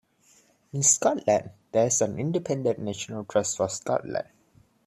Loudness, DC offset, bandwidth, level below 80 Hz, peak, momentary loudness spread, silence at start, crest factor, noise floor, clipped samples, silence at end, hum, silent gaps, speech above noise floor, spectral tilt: -26 LUFS; under 0.1%; 14.5 kHz; -66 dBFS; -6 dBFS; 13 LU; 0.75 s; 22 dB; -61 dBFS; under 0.1%; 0.65 s; none; none; 35 dB; -4 dB/octave